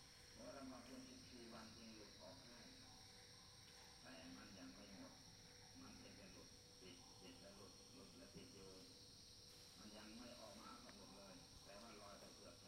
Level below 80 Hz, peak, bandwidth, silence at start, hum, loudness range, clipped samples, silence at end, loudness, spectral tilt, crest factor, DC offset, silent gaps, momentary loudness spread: -76 dBFS; -46 dBFS; 16 kHz; 0 s; none; 2 LU; under 0.1%; 0 s; -61 LUFS; -3 dB/octave; 16 dB; under 0.1%; none; 4 LU